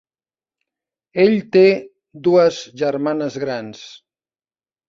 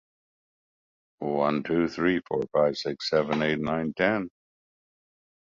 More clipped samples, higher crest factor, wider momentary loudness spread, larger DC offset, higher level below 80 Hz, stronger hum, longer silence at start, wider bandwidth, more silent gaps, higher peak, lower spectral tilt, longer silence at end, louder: neither; about the same, 18 dB vs 20 dB; first, 15 LU vs 6 LU; neither; about the same, -64 dBFS vs -60 dBFS; neither; about the same, 1.15 s vs 1.2 s; about the same, 7.4 kHz vs 7.6 kHz; neither; first, -2 dBFS vs -8 dBFS; about the same, -6 dB/octave vs -6 dB/octave; second, 0.9 s vs 1.2 s; first, -17 LUFS vs -27 LUFS